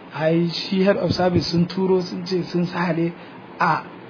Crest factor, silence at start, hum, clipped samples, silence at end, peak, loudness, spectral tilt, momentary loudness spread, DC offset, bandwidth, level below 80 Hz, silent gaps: 16 dB; 0 s; none; under 0.1%; 0 s; -6 dBFS; -21 LUFS; -7 dB/octave; 6 LU; under 0.1%; 5.4 kHz; -52 dBFS; none